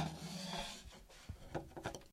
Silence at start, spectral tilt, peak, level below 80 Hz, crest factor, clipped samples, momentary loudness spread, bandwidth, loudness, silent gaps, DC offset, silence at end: 0 s; -4 dB/octave; -26 dBFS; -58 dBFS; 20 dB; under 0.1%; 12 LU; 16 kHz; -47 LUFS; none; under 0.1%; 0 s